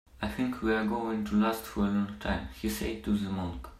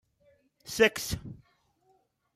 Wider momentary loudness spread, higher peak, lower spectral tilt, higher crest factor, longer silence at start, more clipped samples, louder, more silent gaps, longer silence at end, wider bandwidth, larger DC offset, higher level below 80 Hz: second, 6 LU vs 23 LU; second, -16 dBFS vs -10 dBFS; first, -6 dB/octave vs -3 dB/octave; second, 14 dB vs 24 dB; second, 0.15 s vs 0.65 s; neither; second, -31 LUFS vs -28 LUFS; neither; second, 0 s vs 1 s; about the same, 15 kHz vs 15.5 kHz; neither; first, -46 dBFS vs -56 dBFS